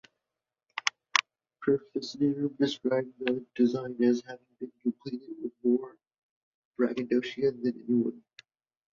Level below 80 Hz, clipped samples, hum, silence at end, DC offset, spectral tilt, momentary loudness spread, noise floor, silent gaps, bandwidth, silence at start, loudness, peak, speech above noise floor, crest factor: -76 dBFS; under 0.1%; none; 0.8 s; under 0.1%; -4.5 dB/octave; 12 LU; -89 dBFS; 6.18-6.71 s; 7.6 kHz; 0.75 s; -30 LUFS; -4 dBFS; 60 dB; 28 dB